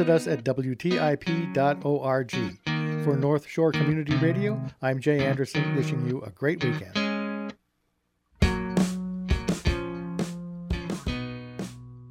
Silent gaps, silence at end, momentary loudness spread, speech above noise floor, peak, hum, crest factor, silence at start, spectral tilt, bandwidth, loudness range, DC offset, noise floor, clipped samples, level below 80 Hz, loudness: none; 0 s; 9 LU; 49 dB; -8 dBFS; none; 18 dB; 0 s; -6.5 dB/octave; 15 kHz; 4 LU; under 0.1%; -74 dBFS; under 0.1%; -40 dBFS; -27 LUFS